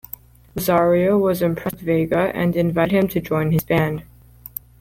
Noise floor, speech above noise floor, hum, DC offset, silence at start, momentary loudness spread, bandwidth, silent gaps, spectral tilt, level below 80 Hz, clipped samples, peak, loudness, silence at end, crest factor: -41 dBFS; 22 dB; none; under 0.1%; 0.55 s; 18 LU; 17 kHz; none; -7 dB/octave; -46 dBFS; under 0.1%; -6 dBFS; -19 LUFS; 0.8 s; 14 dB